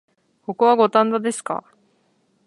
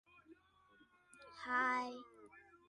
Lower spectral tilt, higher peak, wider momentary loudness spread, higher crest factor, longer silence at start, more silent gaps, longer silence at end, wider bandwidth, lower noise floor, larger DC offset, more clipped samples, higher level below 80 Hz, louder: first, -4.5 dB/octave vs -3 dB/octave; first, -2 dBFS vs -26 dBFS; second, 16 LU vs 26 LU; about the same, 20 dB vs 20 dB; first, 0.5 s vs 0.15 s; neither; first, 0.85 s vs 0.1 s; about the same, 11.5 kHz vs 11 kHz; second, -64 dBFS vs -70 dBFS; neither; neither; first, -78 dBFS vs -84 dBFS; first, -19 LUFS vs -39 LUFS